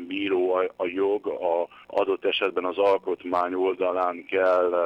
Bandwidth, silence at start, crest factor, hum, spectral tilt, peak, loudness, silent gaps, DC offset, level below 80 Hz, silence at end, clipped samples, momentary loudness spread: 6.2 kHz; 0 s; 14 dB; none; -5.5 dB/octave; -12 dBFS; -25 LUFS; none; under 0.1%; -70 dBFS; 0 s; under 0.1%; 5 LU